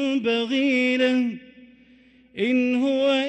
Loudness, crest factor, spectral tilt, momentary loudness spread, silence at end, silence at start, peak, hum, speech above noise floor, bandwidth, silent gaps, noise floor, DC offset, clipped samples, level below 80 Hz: -22 LUFS; 12 dB; -4.5 dB/octave; 9 LU; 0 s; 0 s; -10 dBFS; none; 33 dB; 8.6 kHz; none; -54 dBFS; under 0.1%; under 0.1%; -68 dBFS